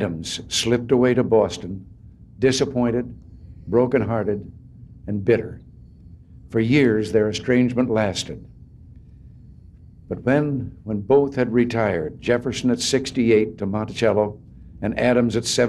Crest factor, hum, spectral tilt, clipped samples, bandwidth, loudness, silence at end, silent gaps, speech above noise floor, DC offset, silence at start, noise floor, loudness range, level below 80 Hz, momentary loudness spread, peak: 16 dB; none; -5.5 dB/octave; under 0.1%; 13 kHz; -21 LUFS; 0 s; none; 25 dB; under 0.1%; 0 s; -45 dBFS; 4 LU; -46 dBFS; 13 LU; -6 dBFS